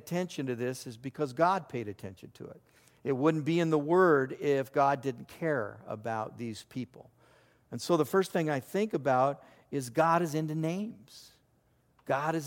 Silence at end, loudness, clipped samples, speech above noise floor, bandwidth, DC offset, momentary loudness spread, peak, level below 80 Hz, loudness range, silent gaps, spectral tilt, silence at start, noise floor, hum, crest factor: 0 s; -31 LUFS; under 0.1%; 39 dB; 17 kHz; under 0.1%; 16 LU; -12 dBFS; -74 dBFS; 5 LU; none; -6.5 dB/octave; 0.05 s; -69 dBFS; none; 20 dB